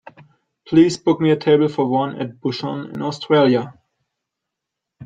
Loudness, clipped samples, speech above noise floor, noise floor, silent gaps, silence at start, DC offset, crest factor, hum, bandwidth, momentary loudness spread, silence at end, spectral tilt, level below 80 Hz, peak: -18 LUFS; under 0.1%; 65 dB; -82 dBFS; none; 0.7 s; under 0.1%; 16 dB; none; 9 kHz; 11 LU; 0 s; -6.5 dB/octave; -62 dBFS; -2 dBFS